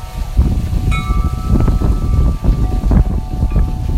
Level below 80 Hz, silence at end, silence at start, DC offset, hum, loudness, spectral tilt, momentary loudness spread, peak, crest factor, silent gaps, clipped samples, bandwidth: -14 dBFS; 0 s; 0 s; under 0.1%; none; -16 LUFS; -8 dB/octave; 4 LU; 0 dBFS; 14 dB; none; under 0.1%; 13.5 kHz